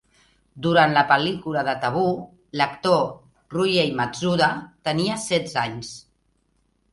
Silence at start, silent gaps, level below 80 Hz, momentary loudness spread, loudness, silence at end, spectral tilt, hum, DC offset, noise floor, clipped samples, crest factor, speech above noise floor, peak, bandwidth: 0.55 s; none; -58 dBFS; 13 LU; -22 LUFS; 0.9 s; -5 dB/octave; none; under 0.1%; -67 dBFS; under 0.1%; 20 dB; 46 dB; -2 dBFS; 11.5 kHz